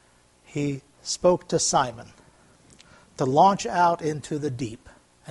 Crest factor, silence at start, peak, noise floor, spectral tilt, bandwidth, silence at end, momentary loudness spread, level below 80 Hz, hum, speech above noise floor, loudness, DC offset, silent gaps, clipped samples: 20 dB; 0.55 s; -6 dBFS; -57 dBFS; -4.5 dB/octave; 11.5 kHz; 0 s; 15 LU; -58 dBFS; none; 34 dB; -24 LUFS; under 0.1%; none; under 0.1%